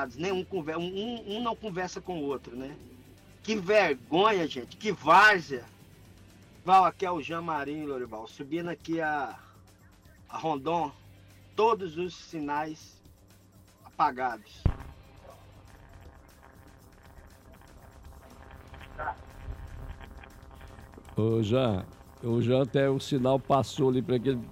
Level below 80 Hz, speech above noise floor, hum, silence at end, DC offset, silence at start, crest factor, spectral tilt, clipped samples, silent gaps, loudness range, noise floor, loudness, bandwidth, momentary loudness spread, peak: -50 dBFS; 29 dB; none; 0 s; under 0.1%; 0 s; 18 dB; -6 dB/octave; under 0.1%; none; 19 LU; -57 dBFS; -28 LUFS; 16 kHz; 22 LU; -12 dBFS